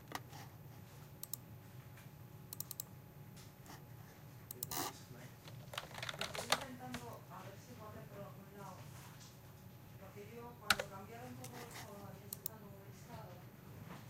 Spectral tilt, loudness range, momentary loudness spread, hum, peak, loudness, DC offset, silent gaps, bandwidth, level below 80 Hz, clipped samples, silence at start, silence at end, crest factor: -3 dB/octave; 8 LU; 18 LU; none; -12 dBFS; -47 LUFS; under 0.1%; none; 16.5 kHz; -70 dBFS; under 0.1%; 0 s; 0 s; 36 dB